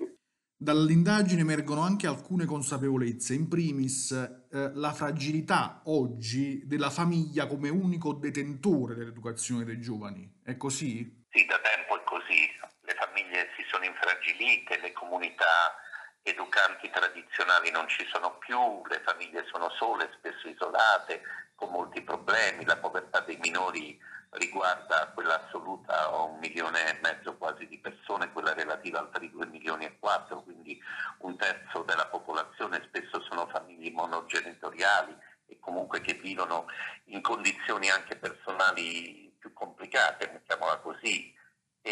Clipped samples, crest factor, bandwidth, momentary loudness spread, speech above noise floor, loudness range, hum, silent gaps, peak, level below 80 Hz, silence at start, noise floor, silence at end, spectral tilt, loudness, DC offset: under 0.1%; 24 dB; 12 kHz; 14 LU; 34 dB; 6 LU; none; none; -6 dBFS; -78 dBFS; 0 s; -64 dBFS; 0 s; -4 dB/octave; -30 LUFS; under 0.1%